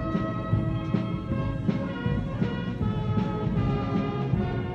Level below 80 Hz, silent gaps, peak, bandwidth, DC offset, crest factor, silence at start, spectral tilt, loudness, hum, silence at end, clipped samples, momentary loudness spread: -40 dBFS; none; -12 dBFS; 6.8 kHz; under 0.1%; 14 dB; 0 s; -9 dB/octave; -28 LUFS; none; 0 s; under 0.1%; 3 LU